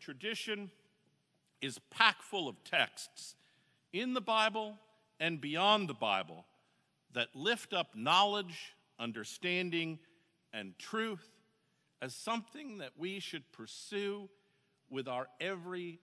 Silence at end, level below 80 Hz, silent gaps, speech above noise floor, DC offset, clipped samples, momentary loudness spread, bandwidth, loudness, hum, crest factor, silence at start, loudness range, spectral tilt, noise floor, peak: 0.05 s; under -90 dBFS; none; 40 dB; under 0.1%; under 0.1%; 18 LU; 11 kHz; -36 LUFS; none; 28 dB; 0 s; 9 LU; -3.5 dB/octave; -77 dBFS; -10 dBFS